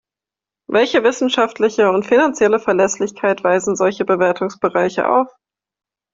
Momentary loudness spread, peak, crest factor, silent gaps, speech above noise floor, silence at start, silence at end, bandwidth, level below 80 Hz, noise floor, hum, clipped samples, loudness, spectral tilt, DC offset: 5 LU; -2 dBFS; 14 dB; none; 73 dB; 0.7 s; 0.85 s; 7.8 kHz; -60 dBFS; -88 dBFS; none; under 0.1%; -16 LUFS; -4 dB/octave; under 0.1%